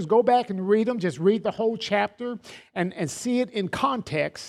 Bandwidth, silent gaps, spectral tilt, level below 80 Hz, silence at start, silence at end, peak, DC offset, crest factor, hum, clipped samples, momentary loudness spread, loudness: 13.5 kHz; none; -5.5 dB/octave; -62 dBFS; 0 s; 0 s; -8 dBFS; under 0.1%; 16 dB; none; under 0.1%; 8 LU; -25 LUFS